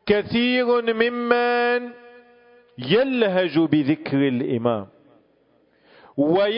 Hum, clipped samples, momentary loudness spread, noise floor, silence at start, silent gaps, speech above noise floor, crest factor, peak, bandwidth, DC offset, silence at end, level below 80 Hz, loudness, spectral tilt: none; under 0.1%; 6 LU; -61 dBFS; 0.05 s; none; 41 dB; 18 dB; -4 dBFS; 5.4 kHz; under 0.1%; 0 s; -58 dBFS; -21 LUFS; -10.5 dB/octave